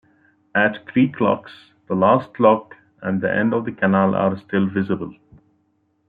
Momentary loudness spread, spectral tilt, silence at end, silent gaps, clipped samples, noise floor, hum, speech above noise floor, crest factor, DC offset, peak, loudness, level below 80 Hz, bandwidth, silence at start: 9 LU; -10 dB/octave; 0.95 s; none; under 0.1%; -65 dBFS; none; 47 dB; 18 dB; under 0.1%; -2 dBFS; -20 LUFS; -64 dBFS; 4.7 kHz; 0.55 s